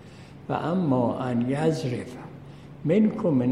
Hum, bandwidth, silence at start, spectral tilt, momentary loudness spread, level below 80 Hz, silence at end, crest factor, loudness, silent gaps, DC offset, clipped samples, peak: none; 11 kHz; 0 s; -8 dB/octave; 20 LU; -58 dBFS; 0 s; 16 dB; -25 LUFS; none; under 0.1%; under 0.1%; -10 dBFS